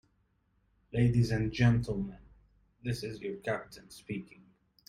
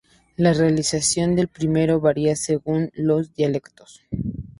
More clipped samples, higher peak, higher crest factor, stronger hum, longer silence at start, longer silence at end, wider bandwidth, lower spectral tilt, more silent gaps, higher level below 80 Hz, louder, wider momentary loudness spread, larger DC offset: neither; second, -14 dBFS vs -4 dBFS; about the same, 20 dB vs 16 dB; neither; first, 0.95 s vs 0.4 s; first, 0.65 s vs 0.1 s; about the same, 12 kHz vs 11.5 kHz; first, -7.5 dB/octave vs -5.5 dB/octave; neither; second, -52 dBFS vs -46 dBFS; second, -32 LUFS vs -21 LUFS; first, 15 LU vs 11 LU; neither